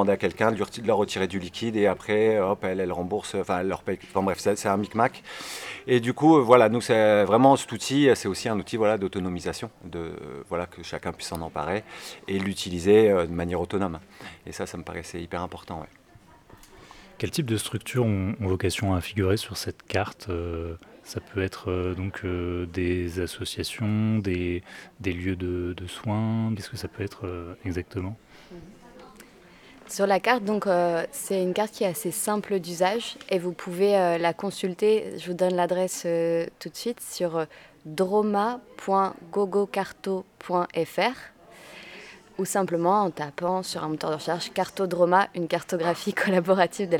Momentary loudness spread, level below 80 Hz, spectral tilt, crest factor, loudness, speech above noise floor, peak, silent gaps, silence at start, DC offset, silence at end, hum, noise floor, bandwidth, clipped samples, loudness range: 14 LU; -58 dBFS; -5.5 dB/octave; 24 dB; -26 LUFS; 28 dB; -2 dBFS; none; 0 s; under 0.1%; 0 s; none; -54 dBFS; 19 kHz; under 0.1%; 10 LU